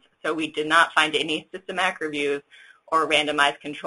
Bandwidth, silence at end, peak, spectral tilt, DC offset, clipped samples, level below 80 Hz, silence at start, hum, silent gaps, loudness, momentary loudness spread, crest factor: 11.5 kHz; 0 s; -4 dBFS; -2.5 dB/octave; under 0.1%; under 0.1%; -66 dBFS; 0.25 s; none; none; -22 LUFS; 10 LU; 22 dB